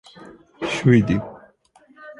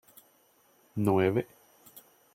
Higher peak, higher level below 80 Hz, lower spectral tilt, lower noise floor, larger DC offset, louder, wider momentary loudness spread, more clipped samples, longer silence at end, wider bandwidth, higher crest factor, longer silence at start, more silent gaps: first, -2 dBFS vs -12 dBFS; first, -48 dBFS vs -68 dBFS; about the same, -7 dB/octave vs -7.5 dB/octave; second, -55 dBFS vs -65 dBFS; neither; first, -20 LUFS vs -29 LUFS; second, 15 LU vs 21 LU; neither; second, 0.05 s vs 0.35 s; second, 11 kHz vs 16.5 kHz; about the same, 20 dB vs 20 dB; second, 0.2 s vs 0.95 s; neither